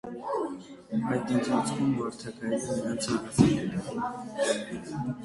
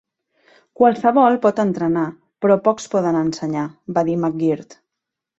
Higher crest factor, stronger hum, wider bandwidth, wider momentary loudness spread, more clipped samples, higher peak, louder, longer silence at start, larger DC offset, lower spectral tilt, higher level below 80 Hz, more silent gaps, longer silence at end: first, 24 dB vs 18 dB; neither; first, 11.5 kHz vs 8 kHz; about the same, 11 LU vs 10 LU; neither; second, -6 dBFS vs -2 dBFS; second, -30 LUFS vs -18 LUFS; second, 0.05 s vs 0.8 s; neither; second, -5.5 dB/octave vs -7 dB/octave; about the same, -56 dBFS vs -60 dBFS; neither; second, 0 s vs 0.65 s